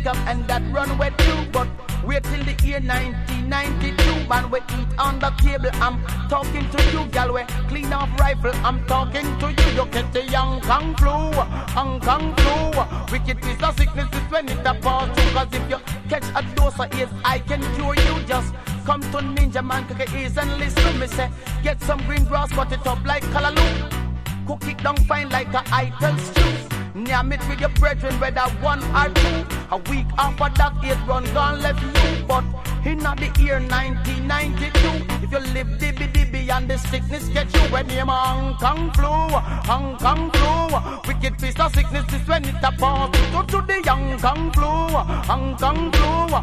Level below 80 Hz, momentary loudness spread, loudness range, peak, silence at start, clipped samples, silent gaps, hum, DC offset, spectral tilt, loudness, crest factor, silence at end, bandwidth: -22 dBFS; 6 LU; 2 LU; -2 dBFS; 0 s; under 0.1%; none; none; under 0.1%; -5.5 dB/octave; -21 LUFS; 18 dB; 0 s; 15.5 kHz